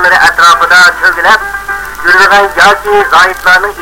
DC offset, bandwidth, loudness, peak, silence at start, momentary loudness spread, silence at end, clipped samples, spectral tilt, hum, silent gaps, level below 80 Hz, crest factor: under 0.1%; over 20 kHz; -5 LUFS; 0 dBFS; 0 s; 8 LU; 0 s; 6%; -1 dB/octave; none; none; -34 dBFS; 6 dB